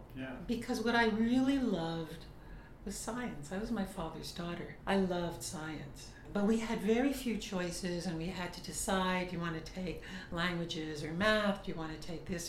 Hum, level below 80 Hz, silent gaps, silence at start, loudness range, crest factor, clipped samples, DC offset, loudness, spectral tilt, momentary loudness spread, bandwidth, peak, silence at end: none; -54 dBFS; none; 0 s; 4 LU; 22 dB; under 0.1%; under 0.1%; -36 LUFS; -5 dB/octave; 14 LU; 16 kHz; -14 dBFS; 0 s